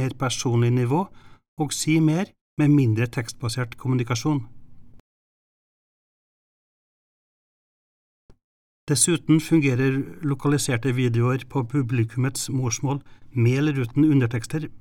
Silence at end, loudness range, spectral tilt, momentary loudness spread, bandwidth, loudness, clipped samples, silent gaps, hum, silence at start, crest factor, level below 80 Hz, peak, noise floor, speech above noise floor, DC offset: 0 s; 8 LU; -5.5 dB/octave; 9 LU; 16.5 kHz; -23 LUFS; under 0.1%; 1.48-1.57 s, 2.41-2.57 s, 5.00-8.29 s, 8.44-8.87 s; none; 0 s; 18 dB; -54 dBFS; -6 dBFS; under -90 dBFS; over 68 dB; under 0.1%